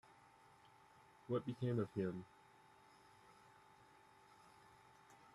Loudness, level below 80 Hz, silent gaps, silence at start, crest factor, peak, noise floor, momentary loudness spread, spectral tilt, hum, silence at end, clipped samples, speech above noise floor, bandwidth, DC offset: -44 LUFS; -82 dBFS; none; 0.65 s; 22 dB; -28 dBFS; -68 dBFS; 25 LU; -8.5 dB/octave; none; 0.2 s; under 0.1%; 25 dB; 12.5 kHz; under 0.1%